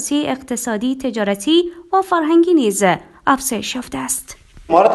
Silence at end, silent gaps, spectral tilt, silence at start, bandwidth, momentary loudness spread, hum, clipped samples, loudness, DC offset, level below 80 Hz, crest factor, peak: 0 s; none; -3.5 dB/octave; 0 s; 12.5 kHz; 9 LU; none; under 0.1%; -17 LUFS; under 0.1%; -50 dBFS; 16 dB; 0 dBFS